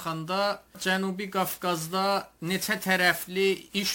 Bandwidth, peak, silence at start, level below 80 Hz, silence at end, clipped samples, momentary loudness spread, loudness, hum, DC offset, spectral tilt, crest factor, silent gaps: 17 kHz; -8 dBFS; 0 s; -64 dBFS; 0 s; under 0.1%; 7 LU; -27 LUFS; none; under 0.1%; -3.5 dB/octave; 20 dB; none